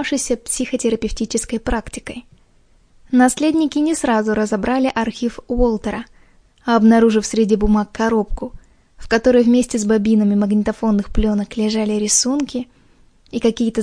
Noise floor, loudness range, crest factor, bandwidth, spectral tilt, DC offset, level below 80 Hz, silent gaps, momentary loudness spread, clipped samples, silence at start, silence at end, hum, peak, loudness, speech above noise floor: -53 dBFS; 3 LU; 16 dB; 10.5 kHz; -4.5 dB/octave; under 0.1%; -32 dBFS; none; 13 LU; under 0.1%; 0 s; 0 s; none; 0 dBFS; -17 LUFS; 36 dB